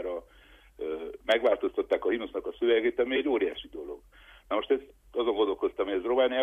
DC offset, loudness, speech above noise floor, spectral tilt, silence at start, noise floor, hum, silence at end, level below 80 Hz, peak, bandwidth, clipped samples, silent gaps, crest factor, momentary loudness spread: under 0.1%; -29 LUFS; 29 dB; -5 dB/octave; 0 s; -56 dBFS; none; 0 s; -58 dBFS; -12 dBFS; 8.2 kHz; under 0.1%; none; 18 dB; 14 LU